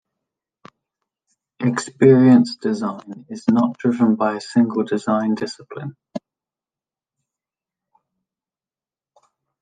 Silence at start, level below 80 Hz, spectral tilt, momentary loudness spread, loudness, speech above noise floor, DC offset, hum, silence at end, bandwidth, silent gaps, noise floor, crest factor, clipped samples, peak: 1.6 s; -66 dBFS; -7 dB/octave; 21 LU; -18 LUFS; over 72 dB; under 0.1%; none; 3.45 s; 9.4 kHz; none; under -90 dBFS; 18 dB; under 0.1%; -2 dBFS